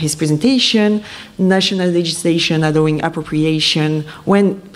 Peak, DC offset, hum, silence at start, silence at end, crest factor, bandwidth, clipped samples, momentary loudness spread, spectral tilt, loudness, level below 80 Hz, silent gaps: -2 dBFS; under 0.1%; none; 0 s; 0.05 s; 12 dB; 14.5 kHz; under 0.1%; 7 LU; -5 dB/octave; -15 LUFS; -48 dBFS; none